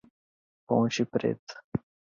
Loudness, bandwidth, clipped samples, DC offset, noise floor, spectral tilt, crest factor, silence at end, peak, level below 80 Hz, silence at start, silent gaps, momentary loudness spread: -30 LUFS; 7.4 kHz; under 0.1%; under 0.1%; under -90 dBFS; -6 dB/octave; 20 dB; 0.4 s; -12 dBFS; -62 dBFS; 0.7 s; 1.39-1.47 s, 1.64-1.72 s; 10 LU